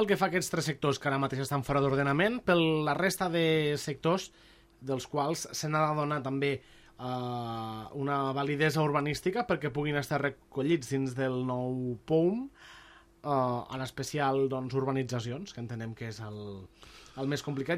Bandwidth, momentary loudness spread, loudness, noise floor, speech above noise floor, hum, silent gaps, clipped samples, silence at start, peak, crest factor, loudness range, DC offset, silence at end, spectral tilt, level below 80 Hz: 16 kHz; 12 LU; -31 LUFS; -56 dBFS; 25 dB; none; none; under 0.1%; 0 s; -14 dBFS; 18 dB; 5 LU; under 0.1%; 0 s; -5.5 dB/octave; -60 dBFS